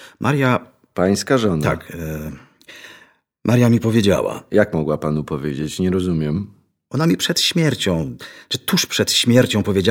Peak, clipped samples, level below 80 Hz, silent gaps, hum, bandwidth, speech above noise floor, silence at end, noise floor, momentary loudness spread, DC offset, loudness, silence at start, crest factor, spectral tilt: -2 dBFS; under 0.1%; -46 dBFS; none; none; 18.5 kHz; 34 dB; 0 s; -51 dBFS; 13 LU; under 0.1%; -18 LUFS; 0 s; 18 dB; -5 dB/octave